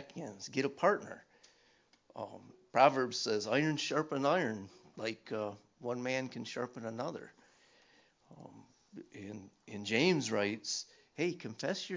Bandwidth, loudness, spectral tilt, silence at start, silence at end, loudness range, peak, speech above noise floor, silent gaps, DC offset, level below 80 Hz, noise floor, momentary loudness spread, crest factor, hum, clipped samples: 7.6 kHz; -35 LUFS; -4.5 dB/octave; 0 s; 0 s; 10 LU; -12 dBFS; 34 dB; none; under 0.1%; -80 dBFS; -70 dBFS; 21 LU; 26 dB; none; under 0.1%